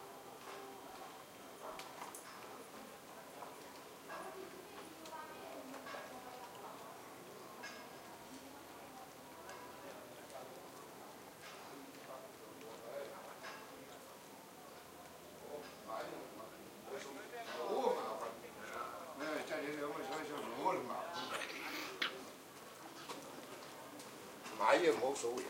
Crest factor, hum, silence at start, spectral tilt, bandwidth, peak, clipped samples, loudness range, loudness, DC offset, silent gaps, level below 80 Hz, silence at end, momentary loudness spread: 30 dB; none; 0 s; -3 dB/octave; 16 kHz; -16 dBFS; under 0.1%; 10 LU; -45 LUFS; under 0.1%; none; -82 dBFS; 0 s; 15 LU